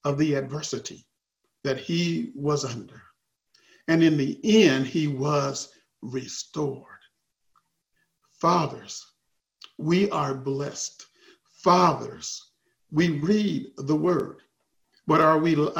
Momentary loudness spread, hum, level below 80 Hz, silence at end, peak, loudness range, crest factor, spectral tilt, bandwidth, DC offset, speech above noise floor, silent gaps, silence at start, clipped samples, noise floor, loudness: 17 LU; none; -64 dBFS; 0 s; -4 dBFS; 7 LU; 22 dB; -5.5 dB/octave; 15.5 kHz; under 0.1%; 55 dB; none; 0.05 s; under 0.1%; -79 dBFS; -25 LUFS